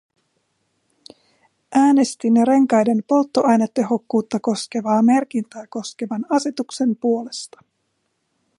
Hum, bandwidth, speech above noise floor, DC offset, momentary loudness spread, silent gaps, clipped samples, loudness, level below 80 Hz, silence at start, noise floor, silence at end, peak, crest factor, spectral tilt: none; 11.5 kHz; 53 dB; under 0.1%; 13 LU; none; under 0.1%; -19 LUFS; -72 dBFS; 1.7 s; -71 dBFS; 1.1 s; -4 dBFS; 16 dB; -5.5 dB/octave